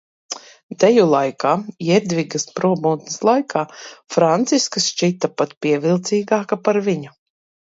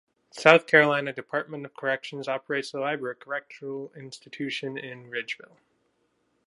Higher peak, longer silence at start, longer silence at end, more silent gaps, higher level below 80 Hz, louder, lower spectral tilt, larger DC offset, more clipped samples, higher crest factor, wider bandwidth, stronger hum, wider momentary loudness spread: about the same, -2 dBFS vs 0 dBFS; about the same, 0.3 s vs 0.35 s; second, 0.6 s vs 1.1 s; first, 0.63-0.69 s, 5.57-5.61 s vs none; first, -66 dBFS vs -78 dBFS; first, -18 LUFS vs -25 LUFS; about the same, -4.5 dB/octave vs -4.5 dB/octave; neither; neither; second, 18 dB vs 28 dB; second, 8 kHz vs 11.5 kHz; neither; second, 11 LU vs 19 LU